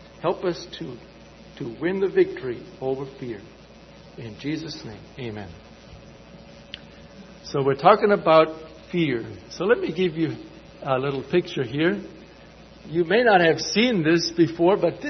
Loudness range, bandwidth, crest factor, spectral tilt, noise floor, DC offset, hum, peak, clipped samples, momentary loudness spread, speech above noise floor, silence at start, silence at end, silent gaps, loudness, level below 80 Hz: 15 LU; 6.4 kHz; 22 dB; -5.5 dB/octave; -47 dBFS; under 0.1%; none; -2 dBFS; under 0.1%; 22 LU; 24 dB; 0 s; 0 s; none; -22 LUFS; -54 dBFS